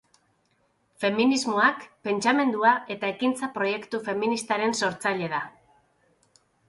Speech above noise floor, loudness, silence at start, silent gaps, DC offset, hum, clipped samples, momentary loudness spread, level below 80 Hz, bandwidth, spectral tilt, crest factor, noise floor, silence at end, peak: 44 dB; -25 LUFS; 1 s; none; under 0.1%; none; under 0.1%; 9 LU; -72 dBFS; 11.5 kHz; -4 dB/octave; 20 dB; -69 dBFS; 1.2 s; -6 dBFS